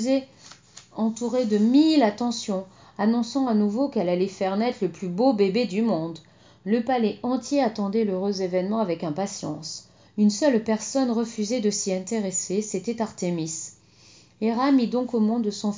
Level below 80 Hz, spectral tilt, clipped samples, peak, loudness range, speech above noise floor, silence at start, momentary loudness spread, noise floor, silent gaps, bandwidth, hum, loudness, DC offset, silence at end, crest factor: -68 dBFS; -5 dB/octave; under 0.1%; -8 dBFS; 3 LU; 30 dB; 0 s; 11 LU; -53 dBFS; none; 7.6 kHz; 60 Hz at -55 dBFS; -24 LUFS; under 0.1%; 0 s; 16 dB